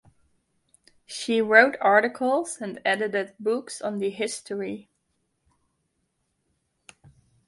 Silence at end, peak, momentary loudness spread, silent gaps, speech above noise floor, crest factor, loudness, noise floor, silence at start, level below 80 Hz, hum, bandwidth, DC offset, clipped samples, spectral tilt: 2.65 s; 0 dBFS; 16 LU; none; 51 dB; 26 dB; -24 LUFS; -75 dBFS; 1.1 s; -72 dBFS; none; 11.5 kHz; under 0.1%; under 0.1%; -3.5 dB/octave